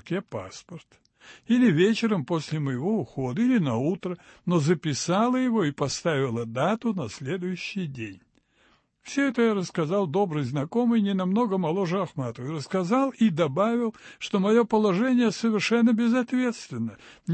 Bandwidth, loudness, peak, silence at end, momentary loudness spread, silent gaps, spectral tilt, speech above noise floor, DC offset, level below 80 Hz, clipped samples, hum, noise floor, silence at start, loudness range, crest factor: 8.8 kHz; -25 LUFS; -8 dBFS; 0 s; 12 LU; none; -6 dB/octave; 39 dB; under 0.1%; -66 dBFS; under 0.1%; none; -64 dBFS; 0.05 s; 5 LU; 16 dB